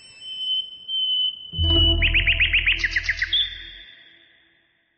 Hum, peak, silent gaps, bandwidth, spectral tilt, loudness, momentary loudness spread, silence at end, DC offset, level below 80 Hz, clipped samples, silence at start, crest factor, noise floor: none; -8 dBFS; none; 8.6 kHz; -4 dB/octave; -20 LUFS; 10 LU; 1.05 s; under 0.1%; -32 dBFS; under 0.1%; 0.05 s; 16 dB; -63 dBFS